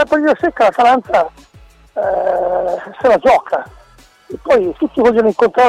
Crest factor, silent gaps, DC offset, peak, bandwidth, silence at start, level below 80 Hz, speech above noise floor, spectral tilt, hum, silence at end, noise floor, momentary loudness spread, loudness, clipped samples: 12 dB; none; under 0.1%; -2 dBFS; 12 kHz; 0 s; -46 dBFS; 32 dB; -5.5 dB/octave; none; 0 s; -46 dBFS; 10 LU; -14 LUFS; under 0.1%